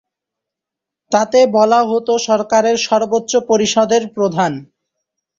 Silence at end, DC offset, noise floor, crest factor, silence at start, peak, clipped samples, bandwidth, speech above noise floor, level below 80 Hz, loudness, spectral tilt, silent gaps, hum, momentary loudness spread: 0.75 s; under 0.1%; -84 dBFS; 14 dB; 1.1 s; -2 dBFS; under 0.1%; 7.8 kHz; 70 dB; -58 dBFS; -14 LUFS; -4 dB/octave; none; none; 7 LU